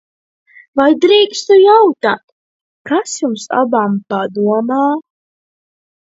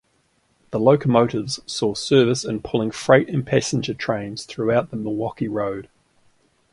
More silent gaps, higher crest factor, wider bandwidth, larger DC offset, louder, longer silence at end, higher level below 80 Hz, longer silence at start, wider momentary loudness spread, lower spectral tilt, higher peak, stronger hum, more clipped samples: first, 2.24-2.85 s vs none; second, 14 dB vs 20 dB; second, 8 kHz vs 11.5 kHz; neither; first, -13 LUFS vs -21 LUFS; first, 1 s vs 0.85 s; second, -64 dBFS vs -54 dBFS; about the same, 0.75 s vs 0.7 s; about the same, 11 LU vs 10 LU; about the same, -4.5 dB/octave vs -5.5 dB/octave; about the same, 0 dBFS vs 0 dBFS; neither; neither